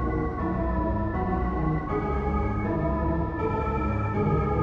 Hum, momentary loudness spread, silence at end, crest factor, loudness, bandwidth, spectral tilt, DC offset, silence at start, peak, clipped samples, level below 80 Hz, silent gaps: none; 3 LU; 0 s; 12 dB; -27 LUFS; 5.4 kHz; -10.5 dB/octave; under 0.1%; 0 s; -12 dBFS; under 0.1%; -32 dBFS; none